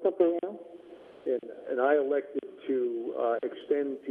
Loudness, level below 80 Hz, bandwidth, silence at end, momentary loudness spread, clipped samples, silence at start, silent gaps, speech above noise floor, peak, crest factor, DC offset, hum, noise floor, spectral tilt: -30 LUFS; -82 dBFS; 3.8 kHz; 0 s; 15 LU; under 0.1%; 0 s; none; 19 dB; -12 dBFS; 18 dB; under 0.1%; none; -50 dBFS; -7.5 dB/octave